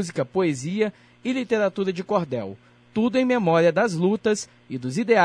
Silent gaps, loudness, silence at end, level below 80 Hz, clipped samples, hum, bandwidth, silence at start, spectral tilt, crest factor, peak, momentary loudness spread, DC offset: none; -23 LUFS; 0 s; -66 dBFS; under 0.1%; none; 10.5 kHz; 0 s; -6 dB/octave; 18 dB; -6 dBFS; 12 LU; under 0.1%